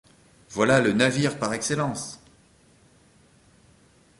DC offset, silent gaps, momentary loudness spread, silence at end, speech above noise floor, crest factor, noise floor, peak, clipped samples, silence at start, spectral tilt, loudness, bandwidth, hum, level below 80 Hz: under 0.1%; none; 17 LU; 2.05 s; 35 dB; 22 dB; -58 dBFS; -6 dBFS; under 0.1%; 0.5 s; -4.5 dB/octave; -23 LUFS; 11.5 kHz; none; -58 dBFS